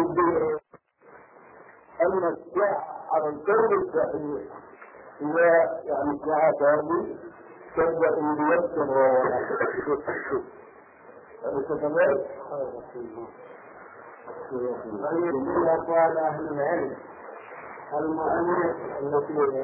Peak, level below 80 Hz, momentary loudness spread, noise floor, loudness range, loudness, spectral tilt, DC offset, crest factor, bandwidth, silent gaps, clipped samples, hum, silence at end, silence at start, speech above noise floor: -10 dBFS; -62 dBFS; 20 LU; -55 dBFS; 6 LU; -25 LUFS; -11.5 dB/octave; under 0.1%; 16 dB; 2.9 kHz; none; under 0.1%; none; 0 s; 0 s; 30 dB